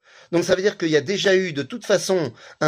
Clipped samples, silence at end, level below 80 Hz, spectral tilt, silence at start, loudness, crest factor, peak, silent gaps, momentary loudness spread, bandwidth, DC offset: under 0.1%; 0 s; -62 dBFS; -4.5 dB/octave; 0.3 s; -21 LUFS; 18 dB; -4 dBFS; none; 8 LU; 15.5 kHz; under 0.1%